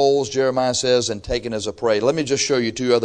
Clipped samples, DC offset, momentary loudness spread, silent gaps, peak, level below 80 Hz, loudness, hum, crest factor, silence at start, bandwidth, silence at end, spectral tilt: under 0.1%; under 0.1%; 6 LU; none; -4 dBFS; -44 dBFS; -20 LUFS; none; 16 dB; 0 s; 10 kHz; 0 s; -3.5 dB/octave